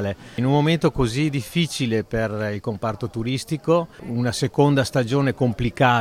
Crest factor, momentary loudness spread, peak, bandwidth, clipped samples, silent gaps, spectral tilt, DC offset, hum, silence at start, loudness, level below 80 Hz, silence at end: 18 dB; 8 LU; -4 dBFS; 15 kHz; under 0.1%; none; -6 dB/octave; under 0.1%; none; 0 s; -22 LUFS; -44 dBFS; 0 s